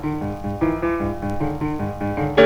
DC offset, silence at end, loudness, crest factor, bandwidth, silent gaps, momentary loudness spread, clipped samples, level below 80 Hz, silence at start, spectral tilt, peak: under 0.1%; 0 s; -24 LUFS; 20 dB; 19 kHz; none; 5 LU; under 0.1%; -38 dBFS; 0 s; -7.5 dB/octave; -2 dBFS